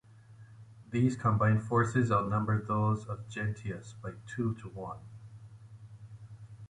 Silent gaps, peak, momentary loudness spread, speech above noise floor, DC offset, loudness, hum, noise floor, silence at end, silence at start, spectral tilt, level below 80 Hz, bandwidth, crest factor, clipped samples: none; -14 dBFS; 23 LU; 24 dB; under 0.1%; -32 LUFS; none; -54 dBFS; 0.05 s; 0.3 s; -8 dB/octave; -58 dBFS; 10 kHz; 18 dB; under 0.1%